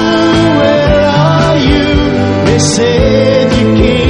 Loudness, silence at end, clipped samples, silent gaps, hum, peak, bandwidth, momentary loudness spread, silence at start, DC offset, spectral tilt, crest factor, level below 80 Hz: -9 LUFS; 0 s; 0.4%; none; none; 0 dBFS; 11 kHz; 2 LU; 0 s; under 0.1%; -5.5 dB/octave; 8 dB; -22 dBFS